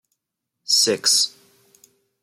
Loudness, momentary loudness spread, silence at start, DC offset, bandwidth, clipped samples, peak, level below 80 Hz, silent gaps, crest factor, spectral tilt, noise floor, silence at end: -17 LUFS; 10 LU; 0.7 s; under 0.1%; 16.5 kHz; under 0.1%; -6 dBFS; -80 dBFS; none; 18 dB; 0 dB/octave; -81 dBFS; 0.95 s